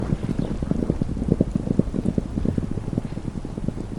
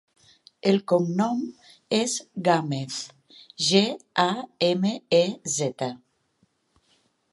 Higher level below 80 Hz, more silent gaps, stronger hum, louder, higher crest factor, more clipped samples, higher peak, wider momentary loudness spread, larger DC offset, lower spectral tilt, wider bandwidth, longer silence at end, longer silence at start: first, -32 dBFS vs -74 dBFS; neither; neither; about the same, -26 LUFS vs -25 LUFS; about the same, 22 dB vs 22 dB; neither; about the same, -2 dBFS vs -4 dBFS; second, 7 LU vs 11 LU; neither; first, -9 dB/octave vs -4 dB/octave; first, 16.5 kHz vs 11.5 kHz; second, 0 s vs 1.35 s; second, 0 s vs 0.65 s